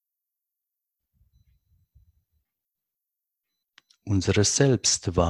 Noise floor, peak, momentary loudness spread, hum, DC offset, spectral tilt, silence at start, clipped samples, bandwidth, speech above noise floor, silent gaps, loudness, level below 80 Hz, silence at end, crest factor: -85 dBFS; -6 dBFS; 8 LU; none; under 0.1%; -4 dB/octave; 4.05 s; under 0.1%; 12 kHz; 63 dB; none; -22 LUFS; -44 dBFS; 0 s; 22 dB